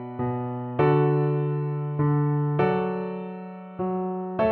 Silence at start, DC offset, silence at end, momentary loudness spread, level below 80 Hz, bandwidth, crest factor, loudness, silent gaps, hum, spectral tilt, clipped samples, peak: 0 s; under 0.1%; 0 s; 11 LU; -58 dBFS; 4.3 kHz; 16 dB; -25 LUFS; none; none; -11.5 dB/octave; under 0.1%; -10 dBFS